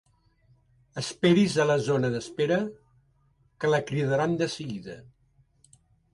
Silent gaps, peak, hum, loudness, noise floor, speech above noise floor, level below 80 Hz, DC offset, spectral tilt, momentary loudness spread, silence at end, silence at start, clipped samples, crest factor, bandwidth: none; -10 dBFS; none; -26 LUFS; -66 dBFS; 40 dB; -62 dBFS; under 0.1%; -6 dB/octave; 16 LU; 1.1 s; 0.95 s; under 0.1%; 18 dB; 11.5 kHz